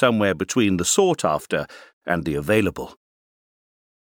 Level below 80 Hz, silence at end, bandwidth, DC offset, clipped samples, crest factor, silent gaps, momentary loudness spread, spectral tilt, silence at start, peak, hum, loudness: -50 dBFS; 1.25 s; 19.5 kHz; under 0.1%; under 0.1%; 20 dB; 1.93-2.01 s; 17 LU; -4 dB/octave; 0 s; -4 dBFS; none; -21 LUFS